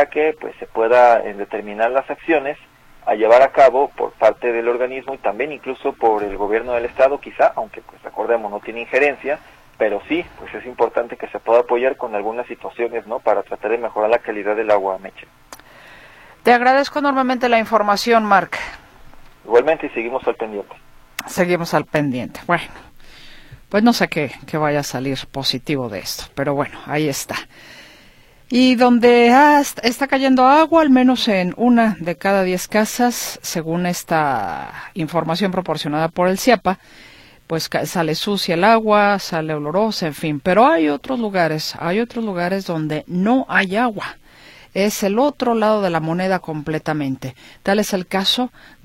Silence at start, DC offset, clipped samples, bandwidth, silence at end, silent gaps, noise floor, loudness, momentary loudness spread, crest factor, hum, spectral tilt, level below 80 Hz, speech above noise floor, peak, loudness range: 0 s; under 0.1%; under 0.1%; 16.5 kHz; 0.35 s; none; -48 dBFS; -18 LUFS; 14 LU; 18 dB; none; -5 dB/octave; -50 dBFS; 30 dB; 0 dBFS; 6 LU